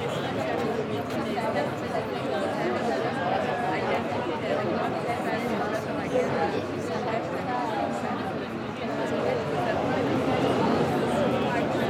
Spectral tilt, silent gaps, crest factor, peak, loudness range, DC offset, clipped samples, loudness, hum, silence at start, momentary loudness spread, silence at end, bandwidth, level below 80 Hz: -6 dB/octave; none; 16 dB; -12 dBFS; 3 LU; under 0.1%; under 0.1%; -27 LUFS; none; 0 s; 5 LU; 0 s; 16.5 kHz; -60 dBFS